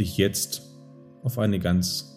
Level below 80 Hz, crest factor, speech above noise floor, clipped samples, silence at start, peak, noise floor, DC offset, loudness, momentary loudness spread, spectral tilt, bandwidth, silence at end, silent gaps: -54 dBFS; 20 dB; 23 dB; under 0.1%; 0 s; -6 dBFS; -48 dBFS; under 0.1%; -26 LUFS; 9 LU; -5 dB/octave; 16.5 kHz; 0 s; none